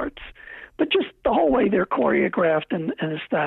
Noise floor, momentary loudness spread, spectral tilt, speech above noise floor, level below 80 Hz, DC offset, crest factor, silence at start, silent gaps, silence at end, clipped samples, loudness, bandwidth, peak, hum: -42 dBFS; 20 LU; -9 dB/octave; 21 dB; -50 dBFS; under 0.1%; 14 dB; 0 s; none; 0 s; under 0.1%; -22 LUFS; 4.2 kHz; -8 dBFS; none